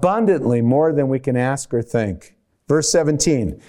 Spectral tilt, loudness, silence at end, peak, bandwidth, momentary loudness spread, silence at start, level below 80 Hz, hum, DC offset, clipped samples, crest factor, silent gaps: -5.5 dB/octave; -18 LUFS; 0.1 s; -4 dBFS; 16 kHz; 6 LU; 0 s; -44 dBFS; none; under 0.1%; under 0.1%; 14 dB; none